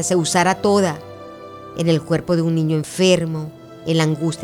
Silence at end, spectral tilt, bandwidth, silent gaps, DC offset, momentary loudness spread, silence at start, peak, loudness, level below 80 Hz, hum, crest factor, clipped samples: 0 s; -5 dB/octave; 14.5 kHz; none; under 0.1%; 18 LU; 0 s; -2 dBFS; -18 LUFS; -54 dBFS; none; 16 dB; under 0.1%